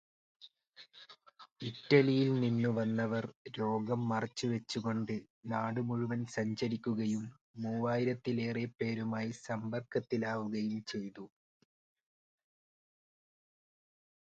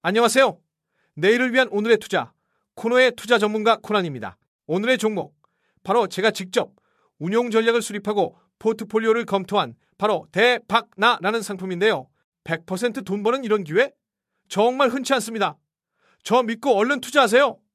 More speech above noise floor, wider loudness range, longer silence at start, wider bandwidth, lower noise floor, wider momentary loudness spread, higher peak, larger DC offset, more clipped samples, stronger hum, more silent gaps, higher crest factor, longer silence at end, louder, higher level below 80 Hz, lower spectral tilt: second, 27 dB vs 56 dB; first, 8 LU vs 3 LU; first, 0.4 s vs 0.05 s; second, 8.8 kHz vs 15 kHz; second, -61 dBFS vs -76 dBFS; first, 14 LU vs 11 LU; second, -12 dBFS vs -2 dBFS; neither; neither; neither; first, 1.52-1.56 s, 3.36-3.45 s, 5.30-5.43 s, 7.41-7.54 s vs 4.48-4.59 s, 12.24-12.32 s; about the same, 24 dB vs 20 dB; first, 2.95 s vs 0.2 s; second, -35 LUFS vs -21 LUFS; about the same, -74 dBFS vs -70 dBFS; first, -6.5 dB/octave vs -4 dB/octave